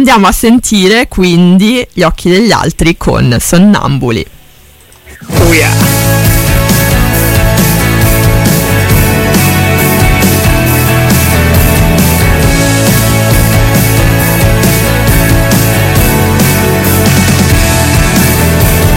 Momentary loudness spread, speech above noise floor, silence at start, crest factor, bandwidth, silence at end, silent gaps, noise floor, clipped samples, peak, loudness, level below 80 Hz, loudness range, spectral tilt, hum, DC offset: 3 LU; 31 dB; 0 s; 6 dB; 17 kHz; 0 s; none; -38 dBFS; 1%; 0 dBFS; -7 LUFS; -16 dBFS; 2 LU; -5 dB/octave; none; under 0.1%